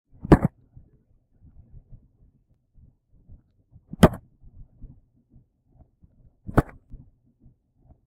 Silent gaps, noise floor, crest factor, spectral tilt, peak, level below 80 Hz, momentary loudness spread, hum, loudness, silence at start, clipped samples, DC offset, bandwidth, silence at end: none; -63 dBFS; 28 dB; -7.5 dB/octave; 0 dBFS; -38 dBFS; 24 LU; none; -22 LUFS; 0.3 s; under 0.1%; under 0.1%; 16 kHz; 1.45 s